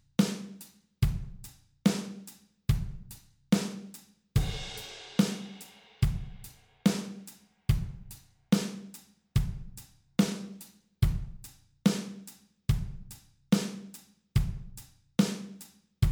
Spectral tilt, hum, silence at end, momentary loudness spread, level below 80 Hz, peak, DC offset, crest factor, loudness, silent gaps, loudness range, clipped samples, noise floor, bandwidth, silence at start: -6 dB/octave; none; 0 s; 21 LU; -40 dBFS; -12 dBFS; under 0.1%; 20 dB; -32 LUFS; none; 2 LU; under 0.1%; -53 dBFS; over 20 kHz; 0.2 s